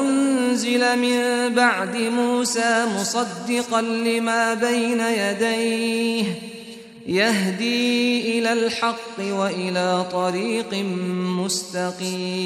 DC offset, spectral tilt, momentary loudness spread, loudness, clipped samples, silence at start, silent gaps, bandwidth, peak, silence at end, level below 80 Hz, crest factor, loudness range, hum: under 0.1%; -4 dB/octave; 6 LU; -21 LUFS; under 0.1%; 0 s; none; 14.5 kHz; -4 dBFS; 0 s; -68 dBFS; 18 dB; 3 LU; none